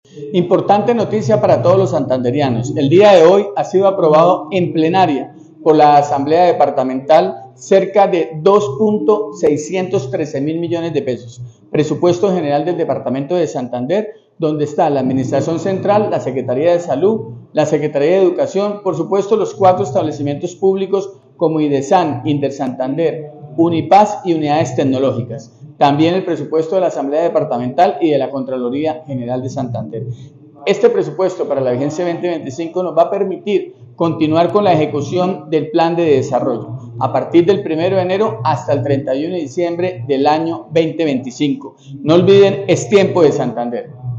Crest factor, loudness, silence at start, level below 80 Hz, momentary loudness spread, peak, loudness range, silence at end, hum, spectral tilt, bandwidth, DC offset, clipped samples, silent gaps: 14 dB; -15 LUFS; 0.15 s; -58 dBFS; 10 LU; 0 dBFS; 6 LU; 0 s; none; -6.5 dB/octave; 7.8 kHz; under 0.1%; under 0.1%; none